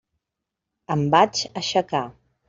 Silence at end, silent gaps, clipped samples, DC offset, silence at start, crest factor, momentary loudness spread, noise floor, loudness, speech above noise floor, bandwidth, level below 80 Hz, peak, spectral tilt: 0.4 s; none; under 0.1%; under 0.1%; 0.9 s; 22 dB; 10 LU; -84 dBFS; -22 LUFS; 63 dB; 7.6 kHz; -60 dBFS; -2 dBFS; -4.5 dB/octave